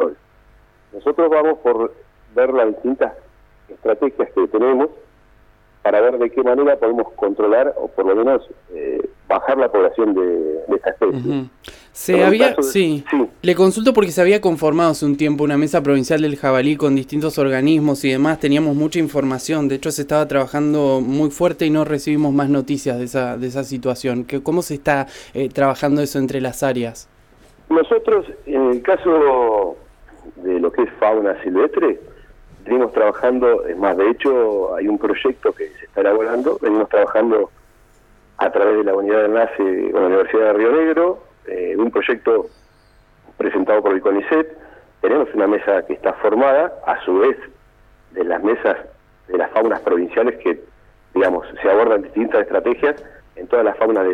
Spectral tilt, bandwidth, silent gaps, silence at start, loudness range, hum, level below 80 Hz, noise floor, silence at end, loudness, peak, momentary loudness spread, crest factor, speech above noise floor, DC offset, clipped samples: -6 dB/octave; 18 kHz; none; 0 s; 4 LU; none; -50 dBFS; -51 dBFS; 0 s; -17 LUFS; 0 dBFS; 8 LU; 18 dB; 35 dB; under 0.1%; under 0.1%